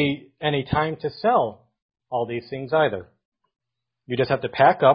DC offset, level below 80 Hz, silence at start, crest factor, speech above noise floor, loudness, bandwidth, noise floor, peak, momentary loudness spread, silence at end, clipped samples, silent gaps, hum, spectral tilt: under 0.1%; -52 dBFS; 0 s; 20 dB; 36 dB; -23 LUFS; 5.4 kHz; -57 dBFS; -2 dBFS; 11 LU; 0 s; under 0.1%; 1.82-1.89 s, 3.25-3.32 s; none; -10.5 dB/octave